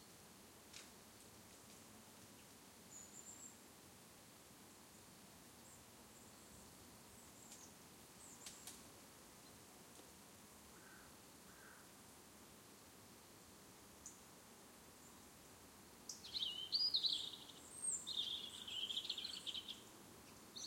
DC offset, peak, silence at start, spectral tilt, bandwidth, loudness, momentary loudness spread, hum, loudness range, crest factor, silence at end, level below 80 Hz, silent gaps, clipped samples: under 0.1%; -28 dBFS; 0 s; -0.5 dB/octave; 16.5 kHz; -45 LUFS; 18 LU; none; 18 LU; 24 dB; 0 s; -80 dBFS; none; under 0.1%